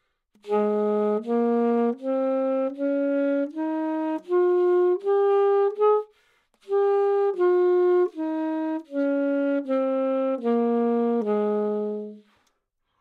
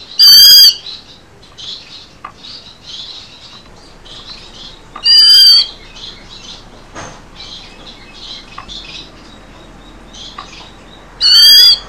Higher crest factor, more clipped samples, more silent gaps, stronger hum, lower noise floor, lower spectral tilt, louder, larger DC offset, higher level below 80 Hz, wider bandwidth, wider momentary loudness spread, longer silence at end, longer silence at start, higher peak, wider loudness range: about the same, 12 dB vs 12 dB; second, under 0.1% vs 2%; neither; neither; first, -74 dBFS vs -40 dBFS; first, -8.5 dB/octave vs 1.5 dB/octave; second, -24 LUFS vs -2 LUFS; second, under 0.1% vs 0.4%; second, -84 dBFS vs -42 dBFS; second, 4.8 kHz vs over 20 kHz; second, 7 LU vs 29 LU; first, 0.8 s vs 0.1 s; first, 0.45 s vs 0.2 s; second, -10 dBFS vs 0 dBFS; second, 2 LU vs 22 LU